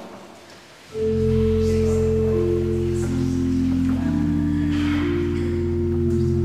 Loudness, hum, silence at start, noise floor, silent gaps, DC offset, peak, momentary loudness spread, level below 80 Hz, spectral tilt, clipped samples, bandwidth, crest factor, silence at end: -21 LUFS; none; 0 s; -44 dBFS; none; under 0.1%; -10 dBFS; 3 LU; -34 dBFS; -8 dB/octave; under 0.1%; 11.5 kHz; 12 dB; 0 s